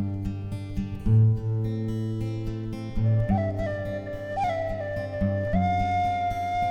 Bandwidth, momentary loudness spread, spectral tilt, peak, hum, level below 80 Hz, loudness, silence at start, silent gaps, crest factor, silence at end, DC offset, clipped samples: 6.8 kHz; 9 LU; -8.5 dB/octave; -12 dBFS; none; -38 dBFS; -27 LUFS; 0 s; none; 14 dB; 0 s; under 0.1%; under 0.1%